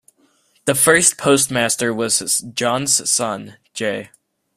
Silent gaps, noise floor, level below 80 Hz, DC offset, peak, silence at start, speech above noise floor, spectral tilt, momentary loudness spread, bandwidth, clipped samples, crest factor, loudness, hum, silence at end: none; -59 dBFS; -58 dBFS; under 0.1%; 0 dBFS; 0.65 s; 41 dB; -2 dB/octave; 12 LU; 16 kHz; under 0.1%; 20 dB; -16 LUFS; none; 0.5 s